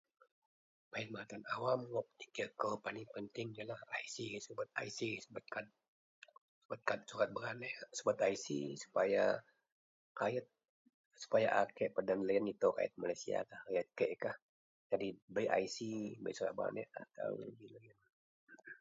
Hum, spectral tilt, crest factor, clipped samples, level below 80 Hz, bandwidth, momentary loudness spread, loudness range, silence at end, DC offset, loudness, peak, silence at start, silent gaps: none; -3.5 dB/octave; 24 dB; under 0.1%; -82 dBFS; 7.6 kHz; 13 LU; 7 LU; 0.05 s; under 0.1%; -40 LUFS; -18 dBFS; 0.95 s; 5.88-6.22 s, 6.41-6.69 s, 9.72-10.15 s, 10.69-10.85 s, 10.94-11.11 s, 14.42-14.90 s, 15.22-15.28 s, 18.13-18.47 s